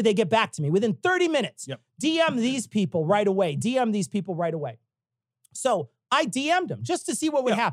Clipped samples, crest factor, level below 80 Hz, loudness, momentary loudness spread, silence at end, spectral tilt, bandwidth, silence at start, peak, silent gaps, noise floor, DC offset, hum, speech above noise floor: under 0.1%; 18 dB; -76 dBFS; -25 LUFS; 7 LU; 0 s; -4.5 dB/octave; 14 kHz; 0 s; -8 dBFS; none; -88 dBFS; under 0.1%; none; 64 dB